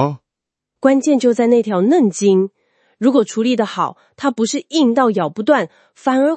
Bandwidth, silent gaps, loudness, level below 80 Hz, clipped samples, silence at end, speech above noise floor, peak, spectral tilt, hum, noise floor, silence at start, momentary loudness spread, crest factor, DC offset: 8.8 kHz; none; -16 LUFS; -70 dBFS; under 0.1%; 0 s; 68 dB; 0 dBFS; -5.5 dB/octave; none; -83 dBFS; 0 s; 9 LU; 14 dB; under 0.1%